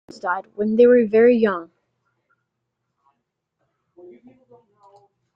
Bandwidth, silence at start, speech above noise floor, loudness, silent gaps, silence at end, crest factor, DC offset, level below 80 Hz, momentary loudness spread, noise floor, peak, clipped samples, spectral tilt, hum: 6 kHz; 0.25 s; 61 dB; -17 LUFS; none; 3.7 s; 18 dB; under 0.1%; -66 dBFS; 12 LU; -78 dBFS; -4 dBFS; under 0.1%; -8 dB/octave; none